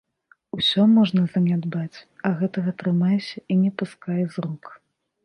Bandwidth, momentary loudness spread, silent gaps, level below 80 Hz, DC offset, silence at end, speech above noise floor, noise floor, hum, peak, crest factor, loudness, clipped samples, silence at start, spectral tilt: 9.6 kHz; 14 LU; none; -66 dBFS; under 0.1%; 0.5 s; 19 dB; -40 dBFS; none; -8 dBFS; 16 dB; -22 LUFS; under 0.1%; 0.55 s; -7.5 dB/octave